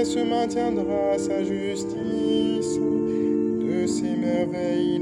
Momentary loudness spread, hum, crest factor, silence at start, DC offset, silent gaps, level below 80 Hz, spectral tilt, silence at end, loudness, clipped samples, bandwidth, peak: 3 LU; none; 12 dB; 0 s; under 0.1%; none; -56 dBFS; -5.5 dB/octave; 0 s; -24 LUFS; under 0.1%; 11 kHz; -12 dBFS